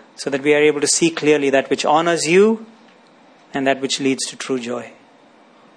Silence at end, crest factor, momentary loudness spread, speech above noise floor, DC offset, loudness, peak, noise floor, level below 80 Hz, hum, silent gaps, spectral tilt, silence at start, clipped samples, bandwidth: 0.9 s; 16 dB; 10 LU; 32 dB; under 0.1%; -17 LUFS; -2 dBFS; -49 dBFS; -66 dBFS; none; none; -3.5 dB/octave; 0.2 s; under 0.1%; 10.5 kHz